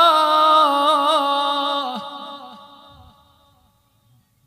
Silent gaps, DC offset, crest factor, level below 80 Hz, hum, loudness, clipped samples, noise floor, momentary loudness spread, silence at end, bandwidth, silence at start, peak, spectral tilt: none; under 0.1%; 18 dB; -66 dBFS; none; -16 LUFS; under 0.1%; -60 dBFS; 20 LU; 1.9 s; 15.5 kHz; 0 s; -2 dBFS; -2 dB/octave